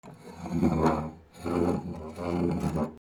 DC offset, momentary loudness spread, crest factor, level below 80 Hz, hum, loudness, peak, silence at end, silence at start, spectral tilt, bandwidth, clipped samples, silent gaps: under 0.1%; 14 LU; 20 dB; -48 dBFS; none; -30 LUFS; -10 dBFS; 0 s; 0.05 s; -8 dB/octave; 17.5 kHz; under 0.1%; none